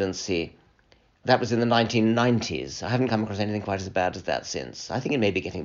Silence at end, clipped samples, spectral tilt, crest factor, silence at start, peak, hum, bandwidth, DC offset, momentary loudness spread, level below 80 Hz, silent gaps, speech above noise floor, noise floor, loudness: 0 s; under 0.1%; -4.5 dB/octave; 20 dB; 0 s; -4 dBFS; none; 7.4 kHz; under 0.1%; 10 LU; -56 dBFS; none; 36 dB; -61 dBFS; -25 LUFS